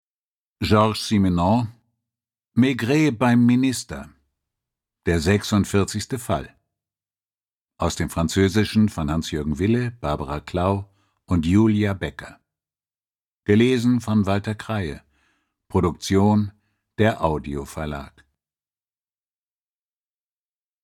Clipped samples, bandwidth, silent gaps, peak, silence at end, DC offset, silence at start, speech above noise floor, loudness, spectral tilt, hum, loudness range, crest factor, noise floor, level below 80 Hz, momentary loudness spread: under 0.1%; 16 kHz; 7.53-7.65 s, 13.27-13.40 s; -4 dBFS; 2.75 s; under 0.1%; 0.6 s; over 70 dB; -22 LUFS; -6 dB/octave; none; 4 LU; 20 dB; under -90 dBFS; -44 dBFS; 12 LU